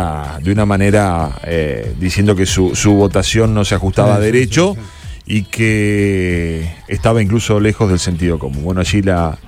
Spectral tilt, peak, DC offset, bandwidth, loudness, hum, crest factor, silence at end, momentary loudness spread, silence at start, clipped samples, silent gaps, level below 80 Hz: -5.5 dB/octave; 0 dBFS; under 0.1%; 15 kHz; -14 LUFS; none; 12 dB; 0 s; 8 LU; 0 s; under 0.1%; none; -28 dBFS